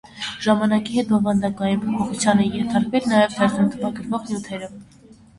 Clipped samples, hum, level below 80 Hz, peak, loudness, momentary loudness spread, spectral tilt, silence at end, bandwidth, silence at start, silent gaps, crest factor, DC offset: under 0.1%; none; -54 dBFS; -2 dBFS; -21 LUFS; 10 LU; -5.5 dB/octave; 0.55 s; 11.5 kHz; 0.15 s; none; 18 dB; under 0.1%